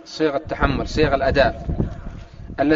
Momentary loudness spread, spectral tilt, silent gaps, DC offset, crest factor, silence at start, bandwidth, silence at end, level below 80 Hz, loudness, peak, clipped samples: 18 LU; -5 dB/octave; none; under 0.1%; 20 dB; 0.05 s; 7.6 kHz; 0 s; -30 dBFS; -21 LUFS; -2 dBFS; under 0.1%